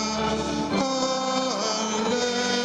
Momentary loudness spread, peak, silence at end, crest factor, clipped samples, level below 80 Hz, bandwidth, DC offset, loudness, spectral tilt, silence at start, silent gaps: 2 LU; -10 dBFS; 0 s; 14 dB; under 0.1%; -50 dBFS; 11 kHz; under 0.1%; -25 LUFS; -3 dB/octave; 0 s; none